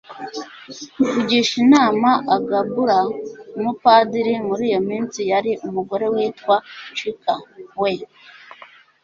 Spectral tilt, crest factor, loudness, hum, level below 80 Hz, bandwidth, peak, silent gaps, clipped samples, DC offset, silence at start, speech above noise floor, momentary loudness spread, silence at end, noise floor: -4.5 dB/octave; 18 dB; -19 LUFS; none; -62 dBFS; 7.8 kHz; -2 dBFS; none; under 0.1%; under 0.1%; 0.1 s; 27 dB; 17 LU; 0.5 s; -46 dBFS